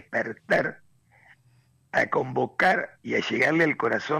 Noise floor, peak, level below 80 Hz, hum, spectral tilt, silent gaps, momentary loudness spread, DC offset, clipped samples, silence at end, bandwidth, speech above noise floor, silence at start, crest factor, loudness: -62 dBFS; -12 dBFS; -68 dBFS; none; -5.5 dB/octave; none; 7 LU; under 0.1%; under 0.1%; 0 s; 15 kHz; 37 dB; 0.1 s; 16 dB; -25 LUFS